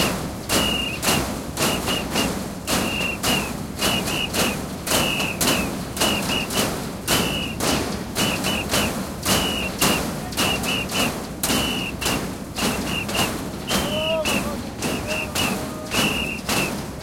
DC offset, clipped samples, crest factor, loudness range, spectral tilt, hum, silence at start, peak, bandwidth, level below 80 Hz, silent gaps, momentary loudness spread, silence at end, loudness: under 0.1%; under 0.1%; 20 dB; 2 LU; -3 dB/octave; none; 0 s; -4 dBFS; 17 kHz; -40 dBFS; none; 6 LU; 0 s; -22 LUFS